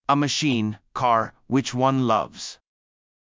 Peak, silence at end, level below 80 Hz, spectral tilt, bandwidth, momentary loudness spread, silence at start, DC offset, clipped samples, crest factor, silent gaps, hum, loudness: -6 dBFS; 0.85 s; -60 dBFS; -5 dB/octave; 7.6 kHz; 10 LU; 0.1 s; under 0.1%; under 0.1%; 18 dB; none; none; -23 LUFS